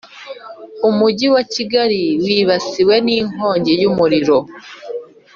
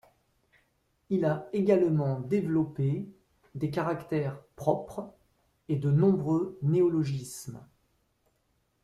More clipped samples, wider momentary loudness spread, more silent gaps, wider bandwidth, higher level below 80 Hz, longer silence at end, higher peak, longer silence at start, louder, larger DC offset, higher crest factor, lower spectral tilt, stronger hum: neither; about the same, 19 LU vs 17 LU; neither; second, 7.4 kHz vs 13.5 kHz; first, -56 dBFS vs -64 dBFS; second, 0.3 s vs 1.2 s; first, -2 dBFS vs -12 dBFS; second, 0.15 s vs 1.1 s; first, -15 LUFS vs -29 LUFS; neither; about the same, 14 dB vs 18 dB; second, -5.5 dB/octave vs -8.5 dB/octave; neither